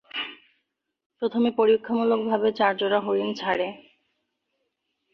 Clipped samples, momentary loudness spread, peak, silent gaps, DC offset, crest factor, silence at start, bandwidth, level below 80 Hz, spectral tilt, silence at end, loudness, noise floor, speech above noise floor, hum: under 0.1%; 11 LU; -8 dBFS; 1.06-1.10 s; under 0.1%; 18 dB; 0.15 s; 6.4 kHz; -72 dBFS; -6 dB/octave; 1.35 s; -24 LUFS; -78 dBFS; 55 dB; none